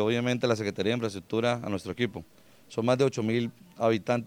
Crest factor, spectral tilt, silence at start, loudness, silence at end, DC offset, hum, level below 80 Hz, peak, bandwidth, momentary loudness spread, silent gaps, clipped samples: 18 dB; -6 dB/octave; 0 s; -29 LUFS; 0 s; under 0.1%; none; -66 dBFS; -10 dBFS; 16 kHz; 8 LU; none; under 0.1%